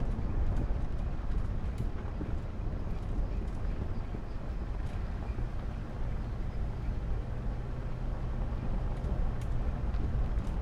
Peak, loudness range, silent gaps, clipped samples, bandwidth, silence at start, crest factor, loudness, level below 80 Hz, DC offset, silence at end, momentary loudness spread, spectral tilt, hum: -20 dBFS; 2 LU; none; under 0.1%; 7 kHz; 0 s; 12 dB; -38 LUFS; -34 dBFS; under 0.1%; 0 s; 4 LU; -8.5 dB/octave; none